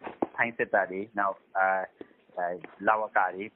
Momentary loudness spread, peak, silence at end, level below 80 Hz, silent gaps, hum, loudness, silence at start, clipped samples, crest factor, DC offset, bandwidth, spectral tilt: 9 LU; -8 dBFS; 0.05 s; -74 dBFS; none; none; -29 LUFS; 0 s; under 0.1%; 22 dB; under 0.1%; 3.9 kHz; -3.5 dB/octave